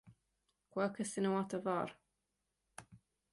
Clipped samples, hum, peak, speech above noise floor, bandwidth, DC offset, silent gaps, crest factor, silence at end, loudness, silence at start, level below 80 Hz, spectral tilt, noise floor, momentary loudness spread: under 0.1%; none; -24 dBFS; 49 dB; 11.5 kHz; under 0.1%; none; 18 dB; 0.35 s; -39 LUFS; 0.05 s; -78 dBFS; -5.5 dB/octave; -87 dBFS; 21 LU